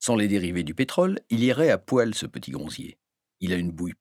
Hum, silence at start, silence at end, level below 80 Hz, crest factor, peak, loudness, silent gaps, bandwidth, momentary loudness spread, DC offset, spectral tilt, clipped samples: none; 0 s; 0.05 s; -56 dBFS; 18 dB; -6 dBFS; -25 LUFS; none; 16 kHz; 13 LU; under 0.1%; -5.5 dB/octave; under 0.1%